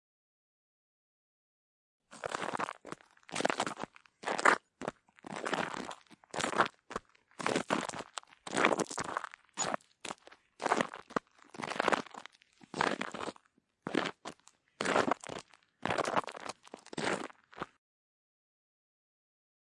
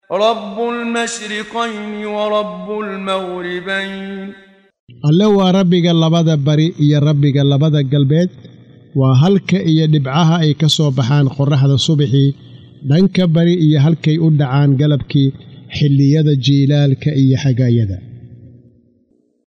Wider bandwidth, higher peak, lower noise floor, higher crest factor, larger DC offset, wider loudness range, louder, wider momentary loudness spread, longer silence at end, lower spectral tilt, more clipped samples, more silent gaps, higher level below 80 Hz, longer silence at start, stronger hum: first, 11.5 kHz vs 9.4 kHz; second, -8 dBFS vs -2 dBFS; first, -67 dBFS vs -57 dBFS; first, 30 dB vs 12 dB; neither; about the same, 5 LU vs 7 LU; second, -36 LUFS vs -14 LUFS; first, 17 LU vs 10 LU; first, 2.1 s vs 1 s; second, -3 dB/octave vs -7 dB/octave; neither; second, none vs 4.80-4.87 s; second, -76 dBFS vs -52 dBFS; first, 2.1 s vs 0.1 s; neither